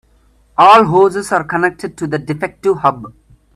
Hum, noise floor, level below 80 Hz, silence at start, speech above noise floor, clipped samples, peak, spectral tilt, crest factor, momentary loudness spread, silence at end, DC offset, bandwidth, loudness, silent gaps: none; -52 dBFS; -50 dBFS; 0.6 s; 39 dB; under 0.1%; 0 dBFS; -5.5 dB/octave; 14 dB; 15 LU; 0.45 s; under 0.1%; 13 kHz; -13 LUFS; none